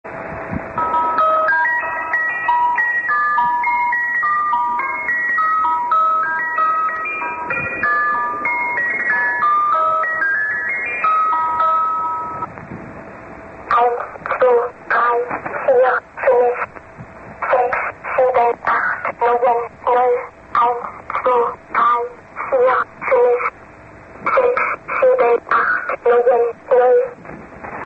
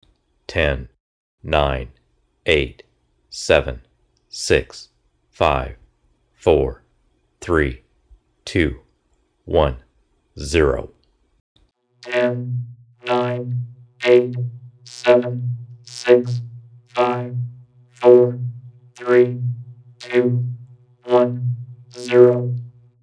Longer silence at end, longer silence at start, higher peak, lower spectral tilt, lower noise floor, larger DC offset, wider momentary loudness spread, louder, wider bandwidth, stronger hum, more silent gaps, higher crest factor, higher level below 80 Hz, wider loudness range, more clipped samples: second, 0 s vs 0.35 s; second, 0.05 s vs 0.5 s; second, -4 dBFS vs 0 dBFS; about the same, -6 dB/octave vs -6 dB/octave; second, -40 dBFS vs -64 dBFS; neither; second, 11 LU vs 22 LU; about the same, -17 LUFS vs -19 LUFS; second, 6 kHz vs 10.5 kHz; neither; second, none vs 1.00-1.38 s, 11.40-11.55 s; second, 14 dB vs 20 dB; second, -52 dBFS vs -36 dBFS; second, 2 LU vs 5 LU; neither